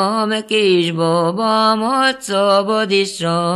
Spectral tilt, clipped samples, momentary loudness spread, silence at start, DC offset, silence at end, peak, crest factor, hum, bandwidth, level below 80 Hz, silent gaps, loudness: -4.5 dB/octave; under 0.1%; 3 LU; 0 s; under 0.1%; 0 s; -2 dBFS; 14 dB; none; 12.5 kHz; -62 dBFS; none; -15 LUFS